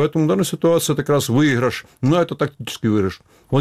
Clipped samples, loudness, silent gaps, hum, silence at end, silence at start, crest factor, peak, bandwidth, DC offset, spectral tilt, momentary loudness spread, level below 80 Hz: under 0.1%; -19 LUFS; none; none; 0 s; 0 s; 14 dB; -4 dBFS; 16 kHz; under 0.1%; -5.5 dB/octave; 8 LU; -52 dBFS